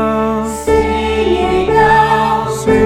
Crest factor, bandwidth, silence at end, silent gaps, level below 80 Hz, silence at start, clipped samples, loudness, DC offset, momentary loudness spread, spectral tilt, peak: 12 dB; 15 kHz; 0 s; none; -28 dBFS; 0 s; under 0.1%; -13 LUFS; 0.3%; 6 LU; -5.5 dB/octave; 0 dBFS